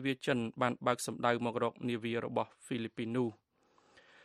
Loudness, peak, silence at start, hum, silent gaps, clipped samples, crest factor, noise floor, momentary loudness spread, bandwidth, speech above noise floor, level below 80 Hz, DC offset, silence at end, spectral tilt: -35 LUFS; -14 dBFS; 0 s; none; none; under 0.1%; 22 dB; -70 dBFS; 7 LU; 13 kHz; 35 dB; -76 dBFS; under 0.1%; 0.9 s; -5 dB/octave